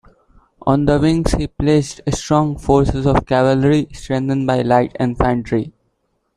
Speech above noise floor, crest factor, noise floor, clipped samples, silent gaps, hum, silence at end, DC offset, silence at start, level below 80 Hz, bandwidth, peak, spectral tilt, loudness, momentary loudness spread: 51 dB; 16 dB; -67 dBFS; under 0.1%; none; none; 0.65 s; under 0.1%; 0.65 s; -32 dBFS; 11.5 kHz; -2 dBFS; -7 dB/octave; -17 LUFS; 8 LU